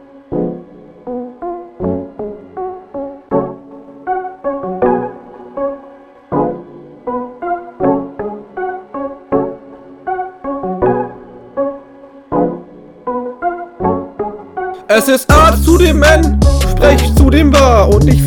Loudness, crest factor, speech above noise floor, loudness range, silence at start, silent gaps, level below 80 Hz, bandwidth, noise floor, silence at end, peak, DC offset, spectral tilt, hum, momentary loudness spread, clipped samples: -14 LUFS; 14 dB; 31 dB; 12 LU; 0.15 s; none; -20 dBFS; 19 kHz; -38 dBFS; 0 s; 0 dBFS; under 0.1%; -6 dB/octave; none; 18 LU; 0.5%